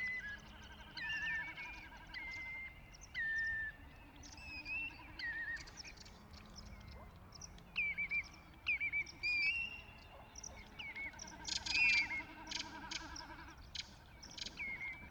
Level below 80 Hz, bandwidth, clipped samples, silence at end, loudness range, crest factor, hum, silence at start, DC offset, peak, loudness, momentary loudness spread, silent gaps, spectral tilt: -60 dBFS; 19.5 kHz; under 0.1%; 0 s; 8 LU; 20 dB; none; 0 s; under 0.1%; -22 dBFS; -40 LUFS; 20 LU; none; -1.5 dB/octave